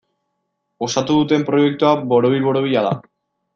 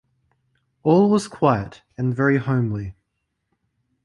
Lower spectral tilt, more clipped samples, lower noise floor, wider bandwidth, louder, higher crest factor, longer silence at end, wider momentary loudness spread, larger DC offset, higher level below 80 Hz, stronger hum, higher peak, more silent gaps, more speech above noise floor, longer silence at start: second, -6 dB/octave vs -7.5 dB/octave; neither; about the same, -73 dBFS vs -76 dBFS; second, 7.6 kHz vs 11.5 kHz; first, -17 LUFS vs -20 LUFS; about the same, 16 dB vs 18 dB; second, 0.55 s vs 1.15 s; second, 7 LU vs 13 LU; neither; second, -60 dBFS vs -52 dBFS; neither; about the same, -2 dBFS vs -4 dBFS; neither; about the same, 57 dB vs 56 dB; about the same, 0.8 s vs 0.85 s